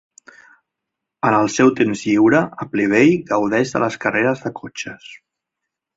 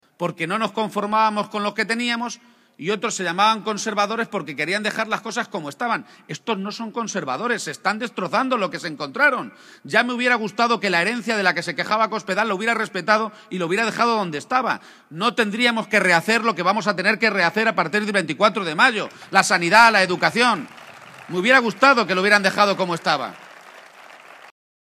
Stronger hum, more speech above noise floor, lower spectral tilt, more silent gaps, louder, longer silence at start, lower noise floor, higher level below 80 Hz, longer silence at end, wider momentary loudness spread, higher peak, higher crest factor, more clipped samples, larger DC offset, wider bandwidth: neither; first, 64 dB vs 24 dB; first, -5.5 dB/octave vs -3.5 dB/octave; neither; first, -17 LUFS vs -20 LUFS; first, 1.25 s vs 0.2 s; first, -81 dBFS vs -44 dBFS; first, -58 dBFS vs -72 dBFS; first, 0.8 s vs 0.4 s; first, 15 LU vs 11 LU; about the same, -2 dBFS vs 0 dBFS; about the same, 18 dB vs 20 dB; neither; neither; second, 8 kHz vs 15.5 kHz